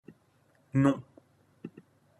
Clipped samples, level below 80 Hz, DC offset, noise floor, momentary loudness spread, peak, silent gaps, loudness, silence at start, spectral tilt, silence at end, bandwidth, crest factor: under 0.1%; -66 dBFS; under 0.1%; -67 dBFS; 22 LU; -12 dBFS; none; -29 LUFS; 0.75 s; -8.5 dB/octave; 0.5 s; 11 kHz; 22 dB